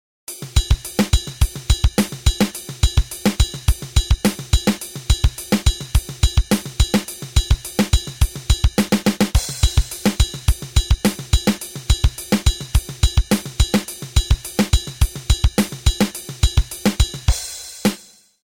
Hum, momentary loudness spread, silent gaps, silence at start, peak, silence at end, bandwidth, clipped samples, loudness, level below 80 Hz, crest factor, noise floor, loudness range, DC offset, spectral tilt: none; 4 LU; none; 0.3 s; -2 dBFS; 0.5 s; over 20 kHz; under 0.1%; -20 LUFS; -20 dBFS; 16 dB; -44 dBFS; 1 LU; 0.2%; -4.5 dB/octave